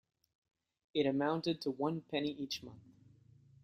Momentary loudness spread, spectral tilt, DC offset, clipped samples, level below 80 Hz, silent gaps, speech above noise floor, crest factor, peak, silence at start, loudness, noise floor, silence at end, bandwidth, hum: 9 LU; -5.5 dB/octave; under 0.1%; under 0.1%; -76 dBFS; none; 27 dB; 20 dB; -20 dBFS; 0.95 s; -37 LUFS; -64 dBFS; 0.85 s; 15 kHz; none